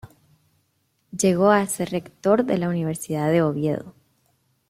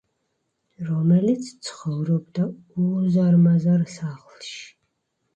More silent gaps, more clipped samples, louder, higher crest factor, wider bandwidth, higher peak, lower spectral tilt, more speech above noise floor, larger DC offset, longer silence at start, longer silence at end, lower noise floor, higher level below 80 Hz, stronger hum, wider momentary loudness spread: neither; neither; about the same, -22 LUFS vs -21 LUFS; first, 20 dB vs 14 dB; first, 16 kHz vs 8.8 kHz; first, -4 dBFS vs -8 dBFS; second, -6 dB/octave vs -8 dB/octave; second, 48 dB vs 53 dB; neither; second, 0.05 s vs 0.8 s; about the same, 0.8 s vs 0.7 s; second, -69 dBFS vs -74 dBFS; about the same, -62 dBFS vs -64 dBFS; neither; second, 9 LU vs 19 LU